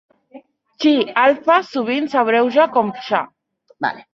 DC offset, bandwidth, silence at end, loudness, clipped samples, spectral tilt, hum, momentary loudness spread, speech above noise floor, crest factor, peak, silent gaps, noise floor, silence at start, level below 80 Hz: under 0.1%; 7.2 kHz; 0.15 s; -17 LUFS; under 0.1%; -5.5 dB/octave; none; 10 LU; 28 dB; 16 dB; -2 dBFS; none; -44 dBFS; 0.35 s; -68 dBFS